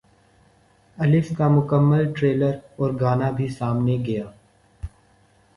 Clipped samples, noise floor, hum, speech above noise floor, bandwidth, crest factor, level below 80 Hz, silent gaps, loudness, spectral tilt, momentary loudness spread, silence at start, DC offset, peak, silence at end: under 0.1%; -58 dBFS; none; 38 dB; 11 kHz; 16 dB; -50 dBFS; none; -21 LUFS; -9.5 dB/octave; 21 LU; 1 s; under 0.1%; -6 dBFS; 0.7 s